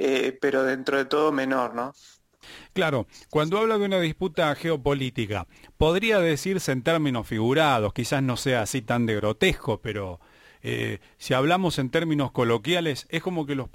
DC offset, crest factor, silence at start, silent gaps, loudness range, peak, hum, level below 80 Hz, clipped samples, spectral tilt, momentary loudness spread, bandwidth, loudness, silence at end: under 0.1%; 18 dB; 0 s; none; 3 LU; -8 dBFS; none; -48 dBFS; under 0.1%; -5.5 dB/octave; 9 LU; 16.5 kHz; -25 LUFS; 0.05 s